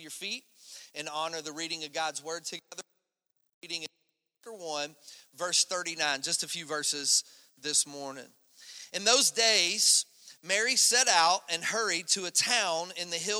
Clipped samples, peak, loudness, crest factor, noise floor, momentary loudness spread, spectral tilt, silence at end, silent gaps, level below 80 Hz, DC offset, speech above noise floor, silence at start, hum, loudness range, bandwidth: under 0.1%; -8 dBFS; -27 LUFS; 24 dB; -79 dBFS; 19 LU; 0.5 dB/octave; 0 s; 3.54-3.62 s; -88 dBFS; under 0.1%; 49 dB; 0 s; none; 14 LU; over 20 kHz